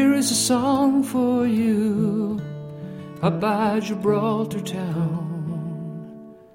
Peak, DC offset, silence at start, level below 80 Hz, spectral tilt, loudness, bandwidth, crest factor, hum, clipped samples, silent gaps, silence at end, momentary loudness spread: -8 dBFS; under 0.1%; 0 s; -60 dBFS; -5.5 dB/octave; -22 LUFS; 16.5 kHz; 14 dB; none; under 0.1%; none; 0.2 s; 16 LU